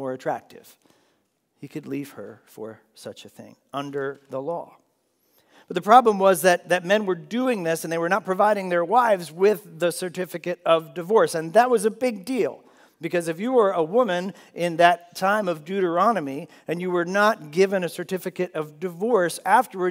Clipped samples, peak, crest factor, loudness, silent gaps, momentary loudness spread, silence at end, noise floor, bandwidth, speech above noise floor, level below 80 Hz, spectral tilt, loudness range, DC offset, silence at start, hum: under 0.1%; 0 dBFS; 22 dB; -22 LUFS; none; 16 LU; 0 s; -70 dBFS; 16 kHz; 47 dB; -82 dBFS; -5 dB/octave; 14 LU; under 0.1%; 0 s; none